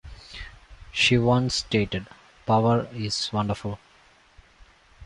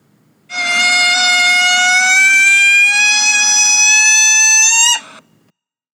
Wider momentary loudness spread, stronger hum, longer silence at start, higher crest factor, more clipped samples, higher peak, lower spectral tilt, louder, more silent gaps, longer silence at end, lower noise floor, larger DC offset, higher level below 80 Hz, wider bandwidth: first, 20 LU vs 5 LU; neither; second, 0.05 s vs 0.5 s; first, 18 dB vs 12 dB; neither; second, -8 dBFS vs 0 dBFS; first, -5 dB/octave vs 4 dB/octave; second, -24 LUFS vs -8 LUFS; neither; second, 0 s vs 0.95 s; second, -57 dBFS vs -62 dBFS; neither; first, -48 dBFS vs -84 dBFS; second, 11.5 kHz vs 18.5 kHz